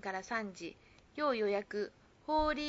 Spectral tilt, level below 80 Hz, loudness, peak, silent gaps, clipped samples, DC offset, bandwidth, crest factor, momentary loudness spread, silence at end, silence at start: -2.5 dB/octave; -56 dBFS; -37 LUFS; -20 dBFS; none; under 0.1%; under 0.1%; 7.6 kHz; 16 dB; 16 LU; 0 s; 0 s